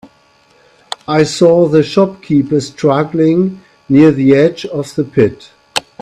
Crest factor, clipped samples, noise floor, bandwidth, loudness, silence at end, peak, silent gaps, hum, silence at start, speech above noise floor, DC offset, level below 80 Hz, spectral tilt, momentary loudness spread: 12 dB; under 0.1%; -50 dBFS; 13.5 kHz; -12 LUFS; 0.2 s; 0 dBFS; none; none; 1.1 s; 39 dB; under 0.1%; -50 dBFS; -6.5 dB/octave; 12 LU